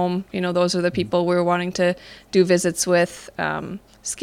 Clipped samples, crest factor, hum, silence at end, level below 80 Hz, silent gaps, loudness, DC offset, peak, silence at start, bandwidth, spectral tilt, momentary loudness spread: under 0.1%; 16 dB; none; 0 s; -54 dBFS; none; -21 LUFS; under 0.1%; -4 dBFS; 0 s; 16 kHz; -4.5 dB/octave; 11 LU